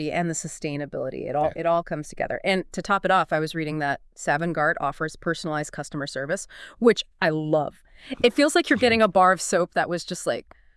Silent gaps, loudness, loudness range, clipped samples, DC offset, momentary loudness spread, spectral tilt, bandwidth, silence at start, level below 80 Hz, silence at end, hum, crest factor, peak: none; -24 LUFS; 5 LU; under 0.1%; under 0.1%; 12 LU; -4.5 dB/octave; 12 kHz; 0 s; -54 dBFS; 0.35 s; none; 20 dB; -4 dBFS